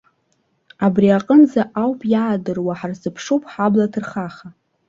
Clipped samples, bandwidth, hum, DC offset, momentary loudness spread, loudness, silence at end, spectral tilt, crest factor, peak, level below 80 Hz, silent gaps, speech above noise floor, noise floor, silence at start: under 0.1%; 7.6 kHz; none; under 0.1%; 14 LU; -18 LUFS; 0.4 s; -7.5 dB/octave; 16 dB; -2 dBFS; -58 dBFS; none; 48 dB; -65 dBFS; 0.8 s